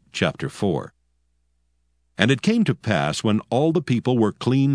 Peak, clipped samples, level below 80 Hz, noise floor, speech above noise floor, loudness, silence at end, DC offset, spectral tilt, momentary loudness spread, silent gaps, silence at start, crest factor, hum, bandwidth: 0 dBFS; under 0.1%; -56 dBFS; -68 dBFS; 48 dB; -22 LUFS; 0 s; under 0.1%; -6 dB/octave; 6 LU; none; 0.15 s; 22 dB; 60 Hz at -50 dBFS; 11 kHz